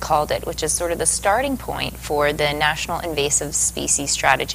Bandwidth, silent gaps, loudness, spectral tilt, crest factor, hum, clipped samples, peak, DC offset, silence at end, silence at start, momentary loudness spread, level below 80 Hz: 16 kHz; none; -20 LUFS; -2 dB/octave; 20 dB; none; under 0.1%; 0 dBFS; under 0.1%; 0 s; 0 s; 7 LU; -38 dBFS